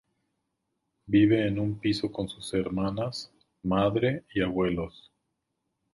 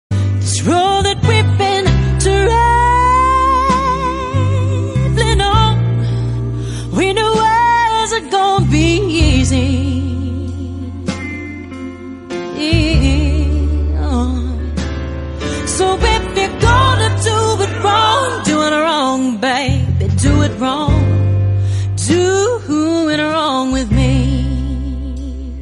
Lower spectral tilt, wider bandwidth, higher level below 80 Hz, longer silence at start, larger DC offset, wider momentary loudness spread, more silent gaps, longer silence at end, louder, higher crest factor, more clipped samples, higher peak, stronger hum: first, -7 dB/octave vs -5.5 dB/octave; about the same, 11.5 kHz vs 11.5 kHz; second, -52 dBFS vs -22 dBFS; first, 1.1 s vs 0.1 s; neither; about the same, 12 LU vs 11 LU; neither; first, 1.05 s vs 0 s; second, -28 LUFS vs -14 LUFS; about the same, 18 dB vs 14 dB; neither; second, -12 dBFS vs 0 dBFS; neither